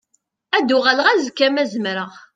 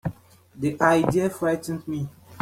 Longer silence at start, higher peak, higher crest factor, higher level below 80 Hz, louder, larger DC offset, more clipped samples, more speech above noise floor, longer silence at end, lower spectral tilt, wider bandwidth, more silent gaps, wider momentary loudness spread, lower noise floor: first, 0.55 s vs 0.05 s; first, 0 dBFS vs -4 dBFS; about the same, 18 dB vs 20 dB; second, -68 dBFS vs -56 dBFS; first, -17 LUFS vs -24 LUFS; neither; neither; first, 49 dB vs 25 dB; first, 0.15 s vs 0 s; second, -3.5 dB/octave vs -6.5 dB/octave; second, 9.2 kHz vs 16 kHz; neither; second, 9 LU vs 13 LU; first, -67 dBFS vs -48 dBFS